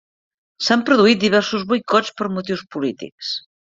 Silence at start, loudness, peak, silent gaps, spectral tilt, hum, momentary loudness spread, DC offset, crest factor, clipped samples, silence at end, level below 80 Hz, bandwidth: 0.6 s; -18 LUFS; -2 dBFS; 3.12-3.18 s; -4.5 dB/octave; none; 12 LU; under 0.1%; 18 dB; under 0.1%; 0.3 s; -62 dBFS; 7.8 kHz